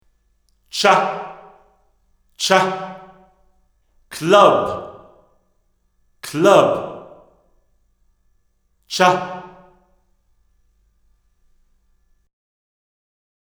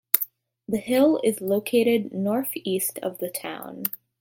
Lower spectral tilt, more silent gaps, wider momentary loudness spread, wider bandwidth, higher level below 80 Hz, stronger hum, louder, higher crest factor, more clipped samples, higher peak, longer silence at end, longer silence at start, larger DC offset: about the same, -4 dB/octave vs -4.5 dB/octave; neither; first, 23 LU vs 10 LU; first, over 20 kHz vs 17 kHz; first, -60 dBFS vs -70 dBFS; neither; first, -16 LUFS vs -25 LUFS; about the same, 22 dB vs 24 dB; neither; about the same, 0 dBFS vs 0 dBFS; first, 3.95 s vs 0.3 s; first, 0.75 s vs 0.15 s; neither